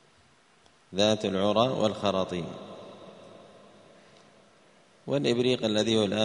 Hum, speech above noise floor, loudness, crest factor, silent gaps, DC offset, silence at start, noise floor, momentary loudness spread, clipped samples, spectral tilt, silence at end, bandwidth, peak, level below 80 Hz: none; 35 dB; -27 LUFS; 22 dB; none; under 0.1%; 0.9 s; -61 dBFS; 21 LU; under 0.1%; -5 dB/octave; 0 s; 10.5 kHz; -8 dBFS; -66 dBFS